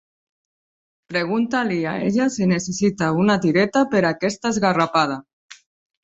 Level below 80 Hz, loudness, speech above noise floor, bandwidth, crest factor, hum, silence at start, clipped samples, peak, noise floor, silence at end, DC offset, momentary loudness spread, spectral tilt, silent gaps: -58 dBFS; -20 LUFS; over 71 dB; 8.2 kHz; 18 dB; none; 1.1 s; under 0.1%; -4 dBFS; under -90 dBFS; 0.5 s; under 0.1%; 5 LU; -5.5 dB/octave; 5.33-5.49 s